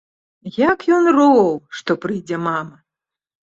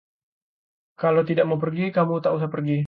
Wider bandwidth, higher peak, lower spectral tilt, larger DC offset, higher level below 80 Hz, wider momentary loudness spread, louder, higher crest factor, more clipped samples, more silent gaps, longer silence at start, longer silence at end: first, 7.8 kHz vs 5 kHz; first, -2 dBFS vs -6 dBFS; second, -6.5 dB/octave vs -10.5 dB/octave; neither; first, -60 dBFS vs -68 dBFS; first, 15 LU vs 5 LU; first, -17 LUFS vs -23 LUFS; about the same, 16 dB vs 16 dB; neither; neither; second, 0.45 s vs 1 s; first, 0.75 s vs 0 s